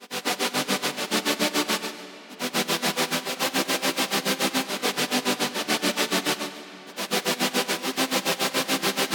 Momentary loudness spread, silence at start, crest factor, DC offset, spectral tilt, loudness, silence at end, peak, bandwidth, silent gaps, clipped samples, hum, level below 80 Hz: 5 LU; 0 s; 18 dB; under 0.1%; -2 dB/octave; -25 LUFS; 0 s; -8 dBFS; 19.5 kHz; none; under 0.1%; none; -74 dBFS